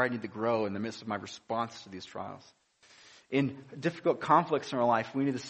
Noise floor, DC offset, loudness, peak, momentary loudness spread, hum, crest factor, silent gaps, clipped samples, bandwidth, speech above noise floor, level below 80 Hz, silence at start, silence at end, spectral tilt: -59 dBFS; under 0.1%; -31 LUFS; -10 dBFS; 16 LU; none; 22 dB; none; under 0.1%; 8.4 kHz; 28 dB; -74 dBFS; 0 s; 0 s; -6 dB/octave